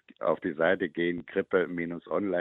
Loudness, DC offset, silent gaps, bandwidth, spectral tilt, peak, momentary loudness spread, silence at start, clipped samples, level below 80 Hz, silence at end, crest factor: -29 LUFS; under 0.1%; none; 4 kHz; -9 dB/octave; -10 dBFS; 6 LU; 0.2 s; under 0.1%; -68 dBFS; 0 s; 18 dB